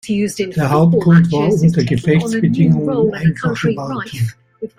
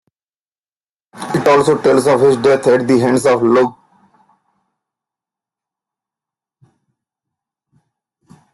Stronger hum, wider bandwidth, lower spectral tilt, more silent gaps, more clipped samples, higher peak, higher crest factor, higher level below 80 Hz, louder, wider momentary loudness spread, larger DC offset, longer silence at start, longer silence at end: neither; about the same, 12.5 kHz vs 12.5 kHz; first, -7.5 dB/octave vs -6 dB/octave; neither; neither; about the same, -2 dBFS vs -2 dBFS; about the same, 12 dB vs 16 dB; first, -46 dBFS vs -58 dBFS; about the same, -15 LUFS vs -13 LUFS; first, 11 LU vs 6 LU; neither; second, 0.05 s vs 1.15 s; second, 0.1 s vs 4.8 s